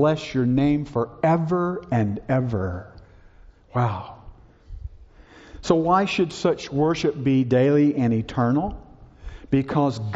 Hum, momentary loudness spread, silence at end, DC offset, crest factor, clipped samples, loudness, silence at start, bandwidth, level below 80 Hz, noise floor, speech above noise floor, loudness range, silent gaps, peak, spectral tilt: none; 18 LU; 0 s; under 0.1%; 18 dB; under 0.1%; -22 LUFS; 0 s; 8 kHz; -46 dBFS; -49 dBFS; 28 dB; 8 LU; none; -4 dBFS; -7 dB/octave